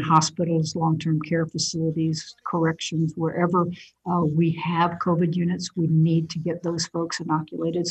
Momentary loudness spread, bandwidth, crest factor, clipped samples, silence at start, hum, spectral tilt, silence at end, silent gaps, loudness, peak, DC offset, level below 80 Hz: 6 LU; 8.6 kHz; 20 dB; under 0.1%; 0 s; none; -5.5 dB/octave; 0 s; none; -24 LUFS; -4 dBFS; under 0.1%; -62 dBFS